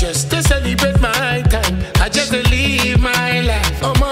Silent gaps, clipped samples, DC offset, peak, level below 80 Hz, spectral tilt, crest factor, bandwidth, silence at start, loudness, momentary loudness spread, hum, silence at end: none; under 0.1%; under 0.1%; 0 dBFS; -20 dBFS; -4 dB/octave; 14 dB; 16.5 kHz; 0 s; -15 LUFS; 3 LU; none; 0 s